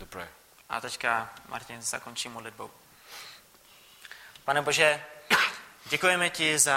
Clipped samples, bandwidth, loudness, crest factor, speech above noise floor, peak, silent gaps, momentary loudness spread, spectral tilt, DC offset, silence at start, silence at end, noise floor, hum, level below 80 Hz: under 0.1%; 16.5 kHz; -27 LUFS; 24 dB; 28 dB; -6 dBFS; none; 22 LU; -1 dB/octave; under 0.1%; 0 s; 0 s; -56 dBFS; none; -68 dBFS